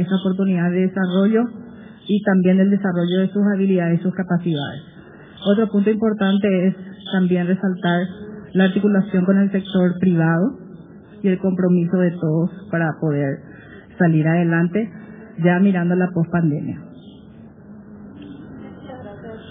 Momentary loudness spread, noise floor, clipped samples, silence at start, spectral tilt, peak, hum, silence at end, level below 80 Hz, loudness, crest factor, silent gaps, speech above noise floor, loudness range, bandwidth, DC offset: 20 LU; -42 dBFS; under 0.1%; 0 s; -7 dB/octave; -4 dBFS; none; 0 s; -58 dBFS; -19 LUFS; 14 dB; none; 24 dB; 3 LU; 3.8 kHz; under 0.1%